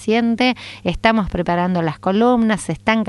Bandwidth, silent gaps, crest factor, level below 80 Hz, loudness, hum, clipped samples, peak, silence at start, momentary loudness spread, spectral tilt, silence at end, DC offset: 11.5 kHz; none; 16 dB; -38 dBFS; -18 LUFS; none; under 0.1%; 0 dBFS; 0 s; 5 LU; -6 dB/octave; 0 s; under 0.1%